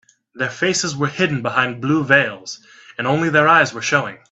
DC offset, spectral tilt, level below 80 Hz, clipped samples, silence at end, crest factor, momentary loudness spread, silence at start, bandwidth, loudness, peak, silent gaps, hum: under 0.1%; -4 dB/octave; -60 dBFS; under 0.1%; 0.15 s; 18 dB; 13 LU; 0.35 s; 8.4 kHz; -17 LUFS; 0 dBFS; none; none